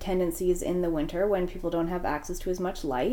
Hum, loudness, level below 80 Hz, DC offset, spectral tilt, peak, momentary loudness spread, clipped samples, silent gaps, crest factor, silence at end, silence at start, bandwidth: none; -29 LUFS; -40 dBFS; under 0.1%; -6 dB/octave; -14 dBFS; 4 LU; under 0.1%; none; 14 dB; 0 s; 0 s; 18 kHz